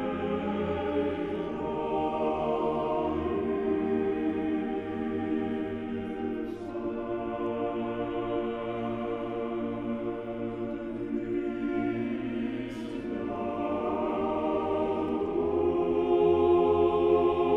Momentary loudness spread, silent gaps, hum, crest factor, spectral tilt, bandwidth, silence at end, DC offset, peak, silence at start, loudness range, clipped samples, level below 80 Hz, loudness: 10 LU; none; none; 18 dB; -8.5 dB/octave; 5.6 kHz; 0 s; under 0.1%; -12 dBFS; 0 s; 6 LU; under 0.1%; -52 dBFS; -30 LUFS